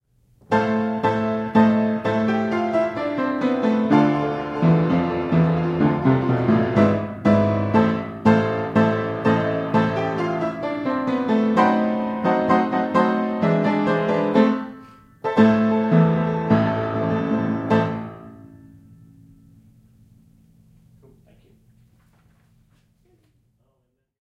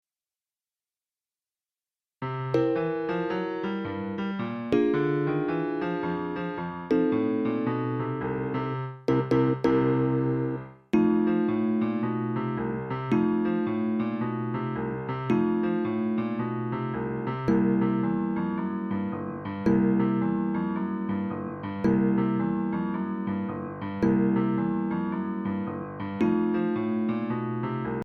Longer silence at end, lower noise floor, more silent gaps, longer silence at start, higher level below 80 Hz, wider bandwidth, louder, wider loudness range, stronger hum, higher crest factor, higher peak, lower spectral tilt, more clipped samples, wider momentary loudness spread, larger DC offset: first, 5.65 s vs 0 s; second, -71 dBFS vs under -90 dBFS; neither; second, 0.5 s vs 2.2 s; about the same, -54 dBFS vs -58 dBFS; first, 7.4 kHz vs 6.2 kHz; first, -20 LUFS vs -27 LUFS; about the same, 4 LU vs 3 LU; neither; about the same, 18 dB vs 16 dB; first, -2 dBFS vs -10 dBFS; about the same, -8.5 dB/octave vs -9.5 dB/octave; neither; about the same, 6 LU vs 8 LU; neither